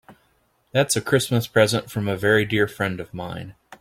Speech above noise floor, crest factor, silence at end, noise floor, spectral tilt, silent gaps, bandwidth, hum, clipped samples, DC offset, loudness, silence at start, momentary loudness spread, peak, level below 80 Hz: 43 dB; 20 dB; 0.05 s; -65 dBFS; -4.5 dB/octave; none; 16.5 kHz; none; under 0.1%; under 0.1%; -22 LUFS; 0.1 s; 13 LU; -4 dBFS; -56 dBFS